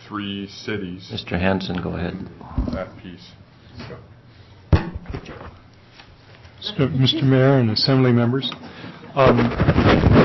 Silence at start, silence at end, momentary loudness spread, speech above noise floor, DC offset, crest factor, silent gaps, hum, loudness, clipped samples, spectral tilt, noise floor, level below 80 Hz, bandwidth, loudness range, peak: 0.05 s; 0 s; 22 LU; 27 dB; under 0.1%; 16 dB; none; none; -20 LUFS; under 0.1%; -7.5 dB/octave; -47 dBFS; -32 dBFS; 6 kHz; 12 LU; -4 dBFS